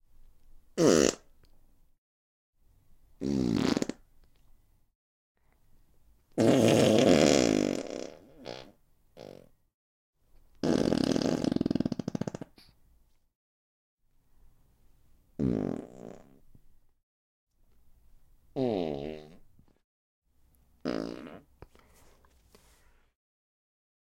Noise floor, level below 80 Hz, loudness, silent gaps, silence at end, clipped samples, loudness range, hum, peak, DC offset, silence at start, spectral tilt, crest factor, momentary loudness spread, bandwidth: -65 dBFS; -58 dBFS; -28 LUFS; 1.98-2.53 s, 4.95-5.35 s, 9.74-10.13 s, 13.35-13.97 s, 17.03-17.47 s, 19.84-20.22 s; 2.65 s; under 0.1%; 17 LU; none; -6 dBFS; under 0.1%; 0.75 s; -5 dB/octave; 26 dB; 25 LU; 16.5 kHz